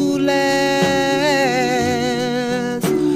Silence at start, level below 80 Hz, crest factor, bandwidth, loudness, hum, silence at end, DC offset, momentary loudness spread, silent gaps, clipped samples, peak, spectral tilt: 0 s; -50 dBFS; 12 dB; 16 kHz; -17 LUFS; none; 0 s; 0.2%; 4 LU; none; under 0.1%; -6 dBFS; -4.5 dB/octave